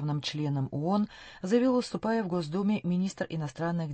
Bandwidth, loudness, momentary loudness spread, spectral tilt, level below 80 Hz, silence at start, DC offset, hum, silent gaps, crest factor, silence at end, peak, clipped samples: 8.8 kHz; -30 LUFS; 7 LU; -7 dB/octave; -64 dBFS; 0 s; under 0.1%; none; none; 16 dB; 0 s; -14 dBFS; under 0.1%